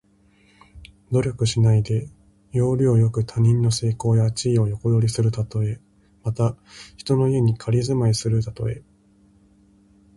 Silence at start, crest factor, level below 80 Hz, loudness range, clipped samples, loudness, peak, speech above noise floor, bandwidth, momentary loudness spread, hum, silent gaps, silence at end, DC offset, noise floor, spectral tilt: 0.75 s; 14 dB; -46 dBFS; 3 LU; under 0.1%; -21 LUFS; -8 dBFS; 37 dB; 11.5 kHz; 11 LU; none; none; 1.35 s; under 0.1%; -57 dBFS; -7 dB/octave